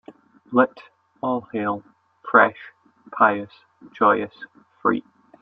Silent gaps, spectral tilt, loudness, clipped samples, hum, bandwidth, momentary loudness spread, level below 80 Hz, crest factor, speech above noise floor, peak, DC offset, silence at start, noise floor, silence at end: none; -8.5 dB/octave; -21 LUFS; under 0.1%; none; 5.2 kHz; 23 LU; -68 dBFS; 22 dB; 25 dB; -2 dBFS; under 0.1%; 0.1 s; -46 dBFS; 0.4 s